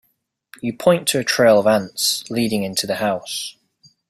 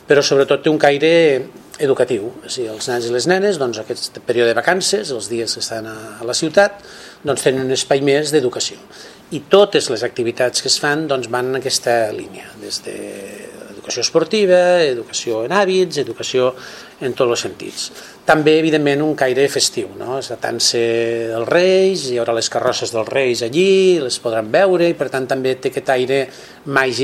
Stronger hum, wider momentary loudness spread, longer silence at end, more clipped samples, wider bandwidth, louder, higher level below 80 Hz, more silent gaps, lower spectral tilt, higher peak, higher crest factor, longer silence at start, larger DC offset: neither; about the same, 13 LU vs 13 LU; first, 0.6 s vs 0 s; neither; first, 16 kHz vs 14 kHz; about the same, -18 LUFS vs -16 LUFS; about the same, -60 dBFS vs -60 dBFS; neither; about the same, -3.5 dB/octave vs -3.5 dB/octave; about the same, -2 dBFS vs 0 dBFS; about the same, 18 dB vs 16 dB; first, 0.65 s vs 0.1 s; neither